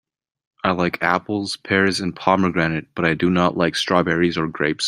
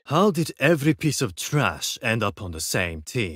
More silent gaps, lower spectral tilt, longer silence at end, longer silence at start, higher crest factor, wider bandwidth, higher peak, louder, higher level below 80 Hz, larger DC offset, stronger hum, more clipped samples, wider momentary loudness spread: neither; about the same, -5 dB/octave vs -4.5 dB/octave; about the same, 0 s vs 0 s; first, 0.65 s vs 0.05 s; about the same, 18 dB vs 18 dB; about the same, 15 kHz vs 16 kHz; first, -2 dBFS vs -6 dBFS; first, -20 LUFS vs -23 LUFS; second, -54 dBFS vs -48 dBFS; neither; neither; neither; about the same, 5 LU vs 7 LU